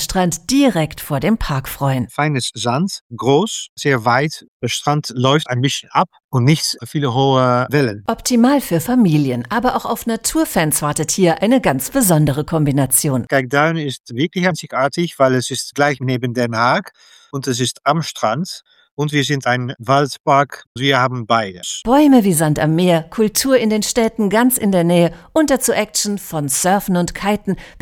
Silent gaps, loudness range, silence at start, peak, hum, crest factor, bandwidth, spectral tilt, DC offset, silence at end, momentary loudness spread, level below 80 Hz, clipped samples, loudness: 3.01-3.10 s, 3.69-3.77 s, 4.48-4.60 s, 6.24-6.29 s, 14.00-14.04 s, 18.91-18.97 s, 20.20-20.24 s, 20.67-20.75 s; 4 LU; 0 s; 0 dBFS; none; 16 dB; 19 kHz; -4.5 dB/octave; under 0.1%; 0 s; 7 LU; -42 dBFS; under 0.1%; -16 LUFS